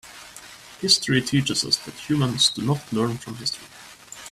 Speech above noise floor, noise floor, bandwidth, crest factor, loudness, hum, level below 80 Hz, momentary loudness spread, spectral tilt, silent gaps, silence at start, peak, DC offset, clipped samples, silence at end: 21 dB; -44 dBFS; 14.5 kHz; 22 dB; -22 LUFS; none; -56 dBFS; 22 LU; -3.5 dB/octave; none; 0.05 s; -4 dBFS; under 0.1%; under 0.1%; 0 s